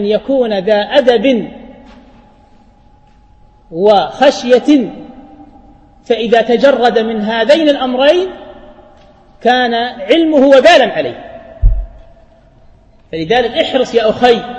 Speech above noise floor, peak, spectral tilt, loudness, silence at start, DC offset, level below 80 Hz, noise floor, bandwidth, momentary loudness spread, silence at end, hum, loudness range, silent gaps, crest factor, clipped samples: 34 dB; 0 dBFS; -5 dB/octave; -11 LUFS; 0 s; under 0.1%; -26 dBFS; -44 dBFS; 8.8 kHz; 15 LU; 0 s; none; 5 LU; none; 12 dB; 0.3%